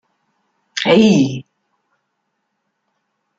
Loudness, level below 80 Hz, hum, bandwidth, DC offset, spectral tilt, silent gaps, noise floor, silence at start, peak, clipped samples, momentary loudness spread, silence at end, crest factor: -13 LUFS; -60 dBFS; none; 7.8 kHz; under 0.1%; -5.5 dB/octave; none; -72 dBFS; 0.75 s; -2 dBFS; under 0.1%; 17 LU; 1.95 s; 18 dB